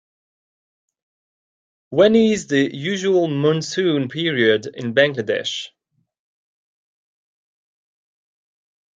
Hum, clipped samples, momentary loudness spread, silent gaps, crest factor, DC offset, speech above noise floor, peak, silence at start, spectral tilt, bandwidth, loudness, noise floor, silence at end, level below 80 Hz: none; under 0.1%; 8 LU; none; 20 dB; under 0.1%; over 72 dB; -2 dBFS; 1.9 s; -5 dB/octave; 9.2 kHz; -18 LUFS; under -90 dBFS; 3.3 s; -64 dBFS